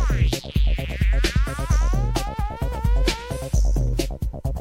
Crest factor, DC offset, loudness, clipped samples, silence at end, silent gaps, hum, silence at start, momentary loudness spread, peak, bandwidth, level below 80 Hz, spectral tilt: 14 dB; under 0.1%; -24 LUFS; under 0.1%; 0 s; none; none; 0 s; 6 LU; -8 dBFS; 15.5 kHz; -22 dBFS; -5.5 dB/octave